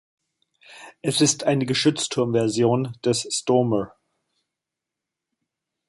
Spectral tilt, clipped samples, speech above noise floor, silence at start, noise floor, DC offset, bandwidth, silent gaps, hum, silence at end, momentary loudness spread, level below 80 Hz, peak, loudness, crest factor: -4.5 dB/octave; under 0.1%; 64 dB; 0.7 s; -86 dBFS; under 0.1%; 12 kHz; none; none; 2 s; 6 LU; -62 dBFS; -6 dBFS; -22 LUFS; 18 dB